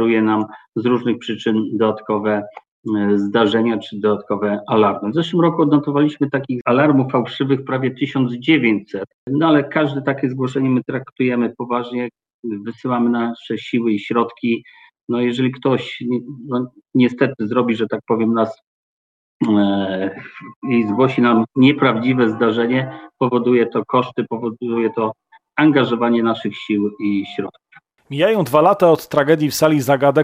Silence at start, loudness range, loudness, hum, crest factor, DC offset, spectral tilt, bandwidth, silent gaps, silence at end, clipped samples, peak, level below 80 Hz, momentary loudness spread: 0 s; 4 LU; -18 LUFS; none; 18 dB; under 0.1%; -6.5 dB/octave; 14.5 kHz; 2.68-2.83 s, 6.61-6.65 s, 9.14-9.27 s, 11.12-11.16 s, 12.34-12.43 s, 15.01-15.07 s, 18.67-19.40 s, 20.56-20.62 s; 0 s; under 0.1%; 0 dBFS; -64 dBFS; 10 LU